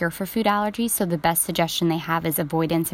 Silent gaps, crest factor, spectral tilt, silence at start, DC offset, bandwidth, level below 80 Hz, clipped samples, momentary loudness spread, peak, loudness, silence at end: none; 16 dB; -4 dB/octave; 0 s; under 0.1%; 16.5 kHz; -52 dBFS; under 0.1%; 3 LU; -6 dBFS; -22 LUFS; 0 s